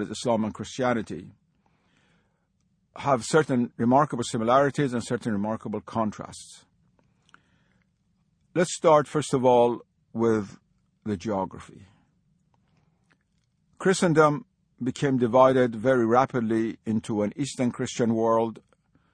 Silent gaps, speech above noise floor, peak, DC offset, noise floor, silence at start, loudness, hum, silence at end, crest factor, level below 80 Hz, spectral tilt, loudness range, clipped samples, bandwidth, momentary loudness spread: none; 46 dB; -6 dBFS; under 0.1%; -71 dBFS; 0 s; -25 LUFS; none; 0.6 s; 20 dB; -62 dBFS; -6 dB/octave; 10 LU; under 0.1%; 10.5 kHz; 13 LU